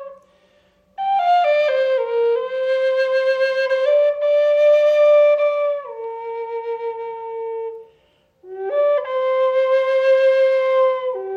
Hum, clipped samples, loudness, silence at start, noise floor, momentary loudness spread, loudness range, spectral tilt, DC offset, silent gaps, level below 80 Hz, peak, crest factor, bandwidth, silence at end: none; under 0.1%; -18 LUFS; 0 s; -59 dBFS; 14 LU; 9 LU; -2.5 dB/octave; under 0.1%; none; -72 dBFS; -6 dBFS; 12 dB; 6.8 kHz; 0 s